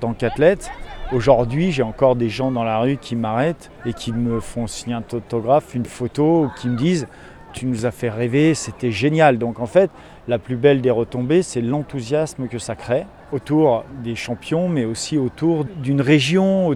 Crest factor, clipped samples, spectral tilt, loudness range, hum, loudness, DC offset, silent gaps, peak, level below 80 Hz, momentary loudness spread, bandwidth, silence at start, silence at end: 18 dB; under 0.1%; -6.5 dB/octave; 4 LU; none; -20 LUFS; under 0.1%; none; 0 dBFS; -42 dBFS; 11 LU; 13 kHz; 0 s; 0 s